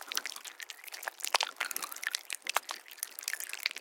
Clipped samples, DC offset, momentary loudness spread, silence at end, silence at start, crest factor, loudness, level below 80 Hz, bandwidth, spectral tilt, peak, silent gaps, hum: under 0.1%; under 0.1%; 12 LU; 0 s; 0 s; 32 dB; -36 LUFS; under -90 dBFS; 17 kHz; 3.5 dB/octave; -6 dBFS; none; none